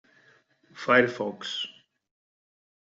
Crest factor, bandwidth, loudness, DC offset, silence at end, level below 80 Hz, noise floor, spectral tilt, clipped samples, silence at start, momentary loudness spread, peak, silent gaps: 24 dB; 7.8 kHz; -26 LUFS; under 0.1%; 1.2 s; -76 dBFS; -62 dBFS; -4.5 dB/octave; under 0.1%; 0.75 s; 14 LU; -6 dBFS; none